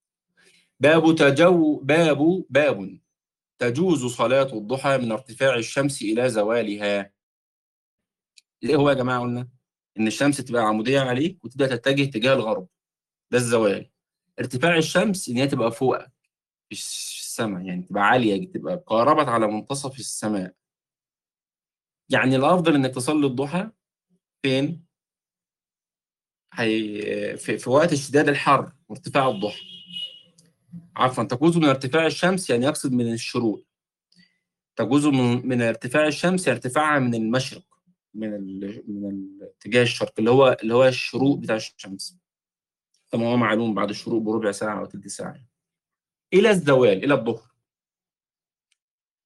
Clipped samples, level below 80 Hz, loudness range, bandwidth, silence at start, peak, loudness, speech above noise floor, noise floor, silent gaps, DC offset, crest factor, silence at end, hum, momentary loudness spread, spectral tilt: under 0.1%; -64 dBFS; 5 LU; 12.5 kHz; 0.8 s; -4 dBFS; -22 LUFS; over 69 dB; under -90 dBFS; 7.23-7.98 s; under 0.1%; 18 dB; 1.85 s; none; 14 LU; -5.5 dB/octave